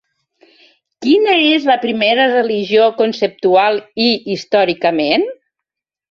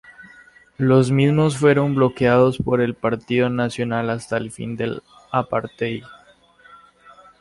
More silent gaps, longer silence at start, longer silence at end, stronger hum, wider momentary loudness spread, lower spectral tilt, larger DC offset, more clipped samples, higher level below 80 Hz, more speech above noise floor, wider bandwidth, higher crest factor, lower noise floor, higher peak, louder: neither; first, 1 s vs 0.2 s; second, 0.8 s vs 1.3 s; neither; second, 5 LU vs 11 LU; second, -5 dB/octave vs -7 dB/octave; neither; neither; second, -62 dBFS vs -52 dBFS; first, 68 dB vs 33 dB; second, 7.4 kHz vs 11.5 kHz; about the same, 14 dB vs 16 dB; first, -82 dBFS vs -52 dBFS; first, 0 dBFS vs -4 dBFS; first, -14 LUFS vs -20 LUFS